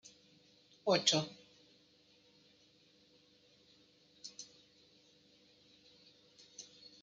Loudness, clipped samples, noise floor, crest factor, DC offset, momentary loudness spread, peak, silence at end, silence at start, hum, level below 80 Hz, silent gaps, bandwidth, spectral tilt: -35 LUFS; under 0.1%; -68 dBFS; 30 dB; under 0.1%; 30 LU; -14 dBFS; 0.4 s; 0.85 s; none; -86 dBFS; none; 10 kHz; -3 dB/octave